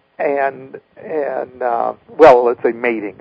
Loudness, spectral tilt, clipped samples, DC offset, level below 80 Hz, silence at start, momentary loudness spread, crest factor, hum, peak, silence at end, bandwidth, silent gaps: -15 LUFS; -6.5 dB/octave; 0.8%; under 0.1%; -52 dBFS; 0.2 s; 15 LU; 16 dB; none; 0 dBFS; 0.1 s; 8 kHz; none